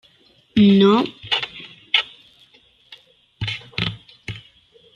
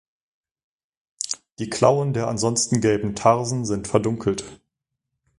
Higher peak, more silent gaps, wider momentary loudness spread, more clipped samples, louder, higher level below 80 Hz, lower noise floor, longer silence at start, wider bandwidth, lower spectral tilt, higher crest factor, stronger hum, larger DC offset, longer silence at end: about the same, -2 dBFS vs -2 dBFS; neither; first, 21 LU vs 11 LU; neither; first, -19 LUFS vs -22 LUFS; about the same, -54 dBFS vs -52 dBFS; second, -56 dBFS vs -81 dBFS; second, 0.55 s vs 1.2 s; second, 7.2 kHz vs 11.5 kHz; first, -6.5 dB/octave vs -5 dB/octave; about the same, 18 dB vs 22 dB; neither; neither; second, 0.55 s vs 0.85 s